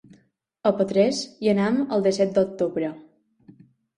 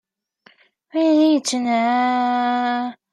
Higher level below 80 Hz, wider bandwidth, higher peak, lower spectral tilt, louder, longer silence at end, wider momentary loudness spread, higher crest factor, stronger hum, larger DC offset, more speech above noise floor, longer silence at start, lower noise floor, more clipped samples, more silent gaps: first, -64 dBFS vs -80 dBFS; about the same, 11 kHz vs 11 kHz; about the same, -6 dBFS vs -6 dBFS; first, -6 dB/octave vs -3 dB/octave; second, -23 LUFS vs -19 LUFS; first, 0.95 s vs 0.2 s; about the same, 5 LU vs 7 LU; about the same, 18 dB vs 14 dB; neither; neither; about the same, 40 dB vs 37 dB; second, 0.65 s vs 0.95 s; first, -62 dBFS vs -56 dBFS; neither; neither